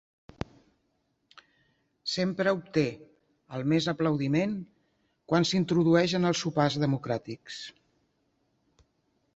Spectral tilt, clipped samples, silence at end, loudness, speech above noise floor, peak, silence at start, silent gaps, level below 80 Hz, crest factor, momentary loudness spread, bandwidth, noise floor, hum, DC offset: -6 dB/octave; under 0.1%; 1.65 s; -28 LUFS; 48 dB; -10 dBFS; 2.05 s; none; -62 dBFS; 20 dB; 18 LU; 8 kHz; -75 dBFS; none; under 0.1%